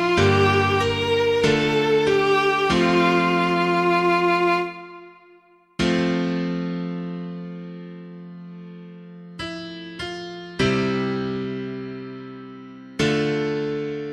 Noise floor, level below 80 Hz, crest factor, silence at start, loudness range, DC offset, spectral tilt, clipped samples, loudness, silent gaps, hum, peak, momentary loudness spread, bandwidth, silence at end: -54 dBFS; -50 dBFS; 16 dB; 0 s; 14 LU; under 0.1%; -6 dB/octave; under 0.1%; -21 LUFS; none; none; -6 dBFS; 21 LU; 13.5 kHz; 0 s